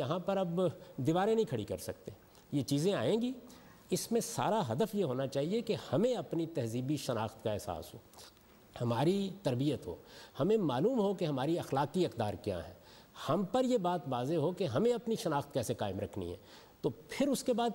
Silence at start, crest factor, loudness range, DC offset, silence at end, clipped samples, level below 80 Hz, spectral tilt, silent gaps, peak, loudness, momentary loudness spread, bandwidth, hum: 0 s; 14 dB; 3 LU; under 0.1%; 0 s; under 0.1%; -66 dBFS; -6 dB/octave; none; -20 dBFS; -34 LUFS; 13 LU; 16 kHz; none